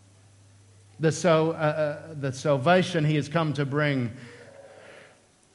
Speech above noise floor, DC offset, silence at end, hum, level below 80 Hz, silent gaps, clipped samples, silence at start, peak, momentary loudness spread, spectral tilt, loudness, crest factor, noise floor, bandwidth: 33 dB; under 0.1%; 0.6 s; none; -70 dBFS; none; under 0.1%; 1 s; -8 dBFS; 11 LU; -6 dB/octave; -25 LUFS; 20 dB; -57 dBFS; 11.5 kHz